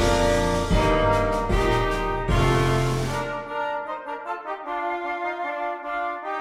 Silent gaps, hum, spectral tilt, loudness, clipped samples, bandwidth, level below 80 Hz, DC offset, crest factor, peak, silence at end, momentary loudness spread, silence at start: none; none; -5.5 dB/octave; -24 LUFS; under 0.1%; 15.5 kHz; -32 dBFS; under 0.1%; 16 dB; -8 dBFS; 0 s; 10 LU; 0 s